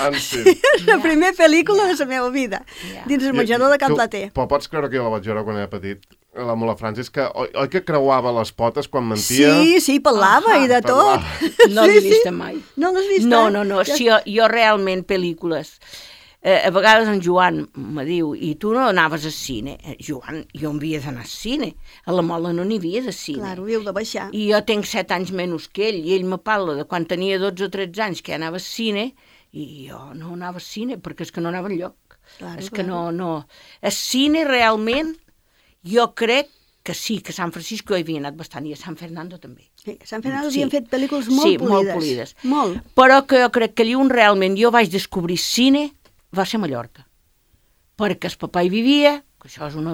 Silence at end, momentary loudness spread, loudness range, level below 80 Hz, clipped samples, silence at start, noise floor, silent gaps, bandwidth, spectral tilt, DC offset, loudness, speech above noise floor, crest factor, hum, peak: 0 s; 18 LU; 12 LU; -52 dBFS; under 0.1%; 0 s; -60 dBFS; none; 17.5 kHz; -4.5 dB/octave; under 0.1%; -18 LUFS; 41 dB; 18 dB; none; 0 dBFS